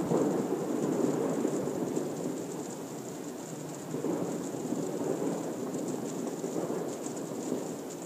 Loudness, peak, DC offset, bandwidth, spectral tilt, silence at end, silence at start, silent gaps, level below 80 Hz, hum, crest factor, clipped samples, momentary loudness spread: -34 LUFS; -14 dBFS; under 0.1%; 15.5 kHz; -6 dB/octave; 0 s; 0 s; none; -76 dBFS; none; 18 dB; under 0.1%; 10 LU